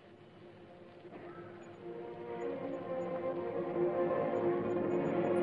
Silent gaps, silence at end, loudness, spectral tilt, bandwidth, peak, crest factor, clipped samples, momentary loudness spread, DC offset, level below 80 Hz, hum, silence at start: none; 0 s; -36 LUFS; -8.5 dB/octave; 10 kHz; -22 dBFS; 16 dB; under 0.1%; 21 LU; under 0.1%; -74 dBFS; none; 0 s